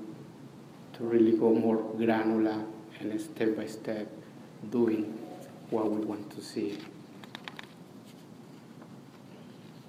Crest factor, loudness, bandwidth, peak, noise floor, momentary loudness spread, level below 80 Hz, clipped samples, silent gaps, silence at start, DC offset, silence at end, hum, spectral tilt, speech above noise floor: 18 dB; -30 LUFS; 15 kHz; -14 dBFS; -50 dBFS; 24 LU; -78 dBFS; under 0.1%; none; 0 s; under 0.1%; 0.05 s; none; -7 dB/octave; 21 dB